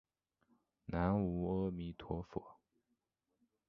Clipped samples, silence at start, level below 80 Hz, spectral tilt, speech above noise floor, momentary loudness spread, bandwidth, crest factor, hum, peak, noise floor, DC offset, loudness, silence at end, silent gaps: under 0.1%; 0.9 s; -56 dBFS; -8 dB/octave; 47 dB; 13 LU; 5.6 kHz; 22 dB; none; -20 dBFS; -86 dBFS; under 0.1%; -40 LUFS; 1.15 s; none